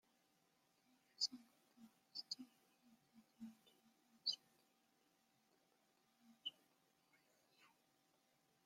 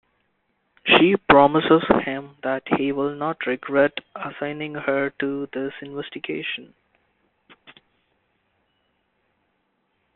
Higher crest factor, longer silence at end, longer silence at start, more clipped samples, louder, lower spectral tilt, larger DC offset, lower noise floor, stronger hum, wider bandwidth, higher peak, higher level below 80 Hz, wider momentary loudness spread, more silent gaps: about the same, 28 dB vs 24 dB; second, 1 s vs 3.5 s; first, 1.2 s vs 0.85 s; neither; second, -48 LUFS vs -21 LUFS; second, -0.5 dB/octave vs -3 dB/octave; neither; first, -81 dBFS vs -71 dBFS; neither; first, 16 kHz vs 4.3 kHz; second, -30 dBFS vs 0 dBFS; second, under -90 dBFS vs -56 dBFS; first, 21 LU vs 16 LU; neither